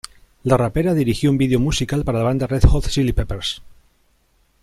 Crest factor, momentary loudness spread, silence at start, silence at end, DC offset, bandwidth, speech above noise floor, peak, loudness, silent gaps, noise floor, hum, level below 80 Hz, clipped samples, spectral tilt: 18 dB; 9 LU; 0.45 s; 0.95 s; under 0.1%; 14 kHz; 43 dB; -2 dBFS; -19 LUFS; none; -60 dBFS; none; -26 dBFS; under 0.1%; -6 dB/octave